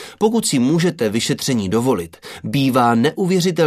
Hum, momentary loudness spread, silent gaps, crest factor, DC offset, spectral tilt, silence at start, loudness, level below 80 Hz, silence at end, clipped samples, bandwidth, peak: none; 8 LU; none; 16 dB; under 0.1%; -5 dB/octave; 0 s; -17 LUFS; -56 dBFS; 0 s; under 0.1%; 14 kHz; -2 dBFS